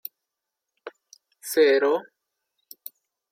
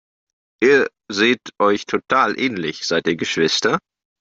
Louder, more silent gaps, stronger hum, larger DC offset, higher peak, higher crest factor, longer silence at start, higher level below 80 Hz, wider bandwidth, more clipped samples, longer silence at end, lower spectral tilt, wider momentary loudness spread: second, -22 LUFS vs -18 LUFS; neither; neither; neither; second, -8 dBFS vs -2 dBFS; about the same, 18 dB vs 16 dB; first, 0.85 s vs 0.6 s; second, -88 dBFS vs -62 dBFS; first, 16.5 kHz vs 7.8 kHz; neither; first, 1.3 s vs 0.4 s; second, -2 dB/octave vs -3.5 dB/octave; first, 25 LU vs 7 LU